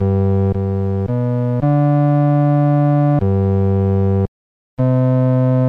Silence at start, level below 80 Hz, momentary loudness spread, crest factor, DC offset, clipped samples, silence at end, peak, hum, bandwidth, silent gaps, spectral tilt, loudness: 0 s; -46 dBFS; 5 LU; 8 dB; under 0.1%; under 0.1%; 0 s; -6 dBFS; none; 4 kHz; 4.28-4.77 s; -12 dB/octave; -16 LUFS